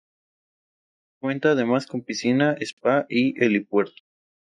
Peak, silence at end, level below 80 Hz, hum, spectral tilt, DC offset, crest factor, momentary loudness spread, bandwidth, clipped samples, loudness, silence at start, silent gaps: -6 dBFS; 0.7 s; -74 dBFS; none; -5.5 dB/octave; under 0.1%; 18 dB; 9 LU; 10.5 kHz; under 0.1%; -23 LUFS; 1.25 s; 2.73-2.77 s